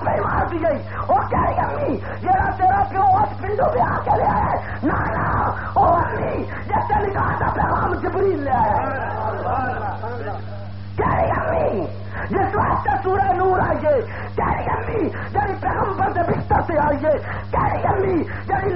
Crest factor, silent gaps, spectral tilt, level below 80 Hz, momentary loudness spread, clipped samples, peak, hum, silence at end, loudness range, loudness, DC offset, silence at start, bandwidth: 14 dB; none; -7 dB/octave; -34 dBFS; 7 LU; under 0.1%; -6 dBFS; none; 0 s; 3 LU; -20 LUFS; 2%; 0 s; 5.6 kHz